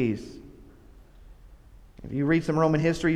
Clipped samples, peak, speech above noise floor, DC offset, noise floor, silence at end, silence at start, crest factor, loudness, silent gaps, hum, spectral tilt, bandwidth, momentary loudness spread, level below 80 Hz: under 0.1%; -10 dBFS; 26 dB; under 0.1%; -51 dBFS; 0 s; 0 s; 18 dB; -25 LUFS; none; none; -7.5 dB/octave; 11.5 kHz; 23 LU; -50 dBFS